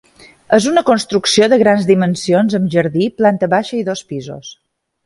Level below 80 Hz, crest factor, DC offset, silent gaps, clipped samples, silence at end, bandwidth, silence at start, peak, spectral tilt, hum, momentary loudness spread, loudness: -54 dBFS; 14 dB; under 0.1%; none; under 0.1%; 0.5 s; 11.5 kHz; 0.5 s; 0 dBFS; -5 dB/octave; none; 13 LU; -14 LUFS